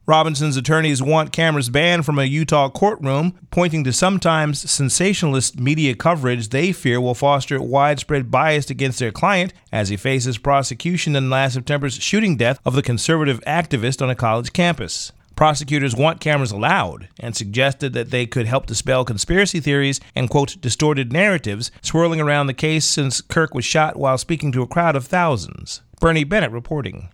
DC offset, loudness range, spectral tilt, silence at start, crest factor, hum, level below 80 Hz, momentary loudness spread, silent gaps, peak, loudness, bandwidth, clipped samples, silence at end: under 0.1%; 2 LU; -4.5 dB/octave; 0.1 s; 18 dB; none; -42 dBFS; 5 LU; none; 0 dBFS; -18 LUFS; 15.5 kHz; under 0.1%; 0.05 s